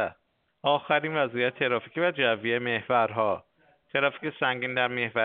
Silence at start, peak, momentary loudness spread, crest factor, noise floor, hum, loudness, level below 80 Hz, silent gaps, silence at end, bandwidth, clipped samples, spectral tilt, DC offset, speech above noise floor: 0 s; -8 dBFS; 5 LU; 18 dB; -70 dBFS; none; -27 LUFS; -72 dBFS; none; 0 s; 4.6 kHz; under 0.1%; -2 dB/octave; under 0.1%; 43 dB